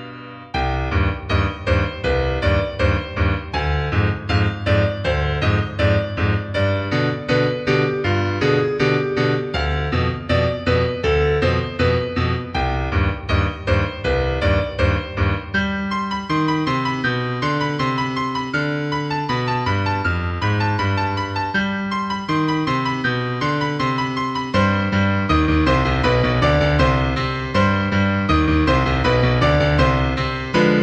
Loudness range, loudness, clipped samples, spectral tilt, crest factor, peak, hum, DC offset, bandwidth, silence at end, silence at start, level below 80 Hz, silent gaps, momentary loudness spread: 3 LU; -19 LUFS; under 0.1%; -7 dB/octave; 16 dB; -4 dBFS; none; under 0.1%; 8.4 kHz; 0 s; 0 s; -30 dBFS; none; 5 LU